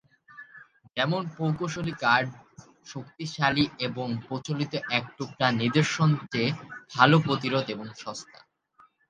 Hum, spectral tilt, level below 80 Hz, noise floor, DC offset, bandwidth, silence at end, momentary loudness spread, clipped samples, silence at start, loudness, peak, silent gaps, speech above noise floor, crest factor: none; -5.5 dB/octave; -62 dBFS; -61 dBFS; under 0.1%; 9.2 kHz; 0.85 s; 15 LU; under 0.1%; 0.35 s; -26 LUFS; -2 dBFS; none; 34 dB; 26 dB